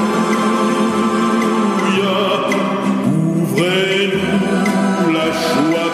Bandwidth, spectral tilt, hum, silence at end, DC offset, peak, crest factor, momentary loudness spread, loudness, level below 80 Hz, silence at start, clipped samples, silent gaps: 15 kHz; -5.5 dB/octave; none; 0 s; under 0.1%; -2 dBFS; 12 dB; 1 LU; -15 LUFS; -54 dBFS; 0 s; under 0.1%; none